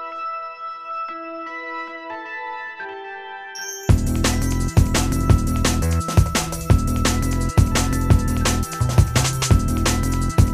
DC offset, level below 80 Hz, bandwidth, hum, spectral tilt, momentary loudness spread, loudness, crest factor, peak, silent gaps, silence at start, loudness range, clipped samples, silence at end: under 0.1%; -26 dBFS; 15.5 kHz; none; -5 dB/octave; 13 LU; -21 LUFS; 18 dB; -2 dBFS; none; 0 s; 10 LU; under 0.1%; 0 s